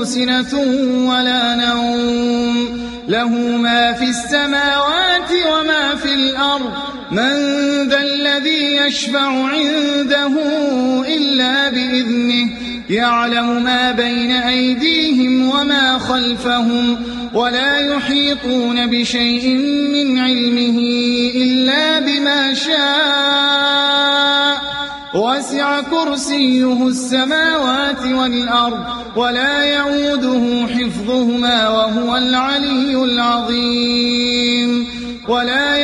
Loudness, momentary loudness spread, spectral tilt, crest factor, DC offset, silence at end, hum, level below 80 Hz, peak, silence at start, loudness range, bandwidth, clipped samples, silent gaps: -14 LUFS; 5 LU; -3 dB/octave; 14 dB; under 0.1%; 0 s; none; -46 dBFS; -2 dBFS; 0 s; 2 LU; 11.5 kHz; under 0.1%; none